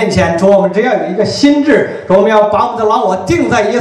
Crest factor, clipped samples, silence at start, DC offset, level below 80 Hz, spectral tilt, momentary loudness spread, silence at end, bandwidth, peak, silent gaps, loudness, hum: 10 dB; 0.4%; 0 s; under 0.1%; -40 dBFS; -6 dB/octave; 4 LU; 0 s; 11.5 kHz; 0 dBFS; none; -10 LUFS; none